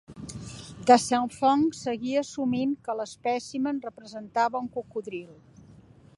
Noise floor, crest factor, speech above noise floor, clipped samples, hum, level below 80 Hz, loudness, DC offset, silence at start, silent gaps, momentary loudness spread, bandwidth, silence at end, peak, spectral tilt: -53 dBFS; 24 dB; 26 dB; under 0.1%; none; -62 dBFS; -27 LUFS; under 0.1%; 0.1 s; none; 19 LU; 11.5 kHz; 0.85 s; -4 dBFS; -4.5 dB/octave